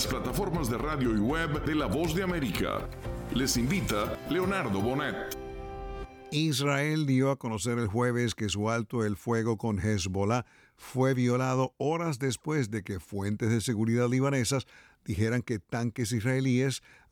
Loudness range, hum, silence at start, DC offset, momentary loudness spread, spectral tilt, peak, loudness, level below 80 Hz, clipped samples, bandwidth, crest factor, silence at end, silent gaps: 2 LU; none; 0 s; under 0.1%; 10 LU; -5.5 dB/octave; -14 dBFS; -30 LUFS; -46 dBFS; under 0.1%; 19.5 kHz; 16 dB; 0.35 s; none